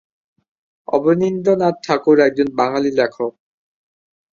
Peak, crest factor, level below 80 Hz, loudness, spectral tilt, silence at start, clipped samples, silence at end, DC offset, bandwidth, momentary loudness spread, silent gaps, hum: 0 dBFS; 18 dB; -60 dBFS; -17 LUFS; -6.5 dB/octave; 0.9 s; under 0.1%; 1.05 s; under 0.1%; 7.4 kHz; 8 LU; none; none